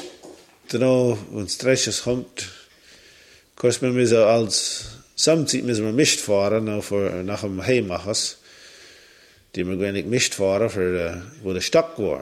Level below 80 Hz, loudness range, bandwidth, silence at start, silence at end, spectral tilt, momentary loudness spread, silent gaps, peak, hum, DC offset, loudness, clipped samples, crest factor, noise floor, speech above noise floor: -54 dBFS; 5 LU; 16 kHz; 0 s; 0 s; -4 dB/octave; 12 LU; none; -4 dBFS; none; under 0.1%; -21 LUFS; under 0.1%; 18 dB; -52 dBFS; 31 dB